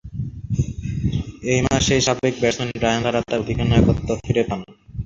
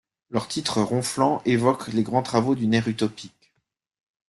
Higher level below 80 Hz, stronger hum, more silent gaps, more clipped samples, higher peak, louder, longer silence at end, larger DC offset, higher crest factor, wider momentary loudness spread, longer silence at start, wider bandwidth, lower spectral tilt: first, -34 dBFS vs -60 dBFS; neither; neither; neither; first, -2 dBFS vs -6 dBFS; first, -21 LUFS vs -24 LUFS; second, 0 s vs 1 s; neither; about the same, 18 dB vs 18 dB; about the same, 9 LU vs 8 LU; second, 0.05 s vs 0.3 s; second, 7.8 kHz vs 12.5 kHz; about the same, -5 dB/octave vs -5.5 dB/octave